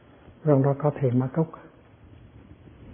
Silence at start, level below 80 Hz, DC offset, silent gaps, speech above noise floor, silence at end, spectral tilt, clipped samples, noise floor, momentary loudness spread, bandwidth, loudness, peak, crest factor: 0.45 s; -58 dBFS; under 0.1%; none; 28 dB; 0 s; -13.5 dB/octave; under 0.1%; -51 dBFS; 9 LU; 3.5 kHz; -25 LUFS; -6 dBFS; 20 dB